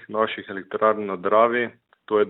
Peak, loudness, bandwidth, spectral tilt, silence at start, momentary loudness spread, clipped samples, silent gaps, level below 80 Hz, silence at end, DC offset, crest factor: -4 dBFS; -23 LUFS; 4.1 kHz; -9 dB/octave; 0 s; 12 LU; under 0.1%; none; -72 dBFS; 0 s; under 0.1%; 18 dB